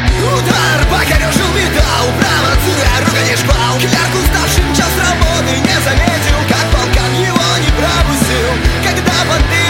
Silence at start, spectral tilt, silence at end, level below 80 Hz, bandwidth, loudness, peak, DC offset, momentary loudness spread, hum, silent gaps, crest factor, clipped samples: 0 s; -4 dB/octave; 0 s; -18 dBFS; 17 kHz; -11 LUFS; 0 dBFS; under 0.1%; 1 LU; none; none; 12 dB; under 0.1%